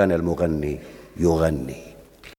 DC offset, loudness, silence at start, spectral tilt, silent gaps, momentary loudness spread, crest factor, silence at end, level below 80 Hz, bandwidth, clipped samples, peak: under 0.1%; -23 LUFS; 0 s; -7.5 dB/octave; none; 16 LU; 20 dB; 0.1 s; -40 dBFS; 17 kHz; under 0.1%; -4 dBFS